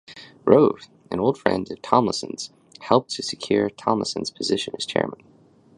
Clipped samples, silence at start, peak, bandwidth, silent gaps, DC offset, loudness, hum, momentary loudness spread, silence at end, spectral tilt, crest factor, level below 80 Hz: under 0.1%; 0.1 s; 0 dBFS; 11 kHz; none; under 0.1%; -23 LUFS; none; 15 LU; 0.6 s; -5 dB/octave; 22 dB; -58 dBFS